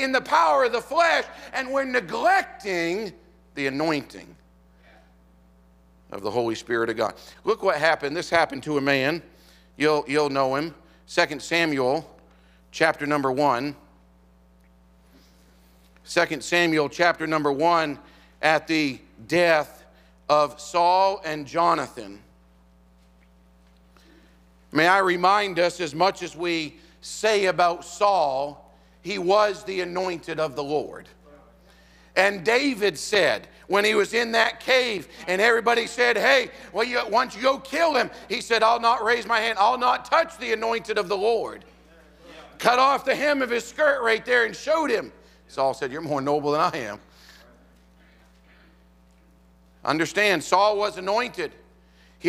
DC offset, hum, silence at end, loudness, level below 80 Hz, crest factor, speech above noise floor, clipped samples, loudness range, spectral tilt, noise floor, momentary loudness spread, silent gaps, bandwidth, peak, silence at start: under 0.1%; none; 0 s; -23 LUFS; -58 dBFS; 22 dB; 33 dB; under 0.1%; 8 LU; -3.5 dB/octave; -56 dBFS; 11 LU; none; 16 kHz; -2 dBFS; 0 s